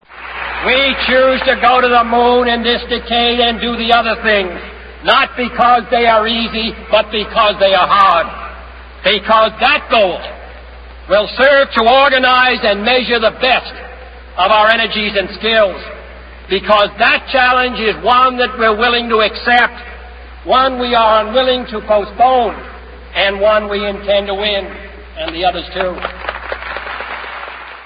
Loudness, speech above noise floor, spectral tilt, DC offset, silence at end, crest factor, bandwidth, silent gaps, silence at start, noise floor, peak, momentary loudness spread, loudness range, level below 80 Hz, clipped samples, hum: -12 LUFS; 20 dB; -6 dB/octave; under 0.1%; 0 s; 14 dB; 5.2 kHz; none; 0.1 s; -33 dBFS; 0 dBFS; 16 LU; 5 LU; -36 dBFS; under 0.1%; none